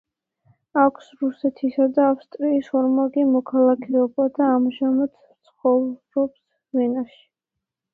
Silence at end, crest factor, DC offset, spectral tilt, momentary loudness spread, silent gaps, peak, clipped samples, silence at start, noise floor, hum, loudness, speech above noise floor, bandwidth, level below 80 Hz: 0.9 s; 18 dB; under 0.1%; -8 dB/octave; 9 LU; none; -4 dBFS; under 0.1%; 0.75 s; -84 dBFS; none; -21 LUFS; 64 dB; 4.4 kHz; -68 dBFS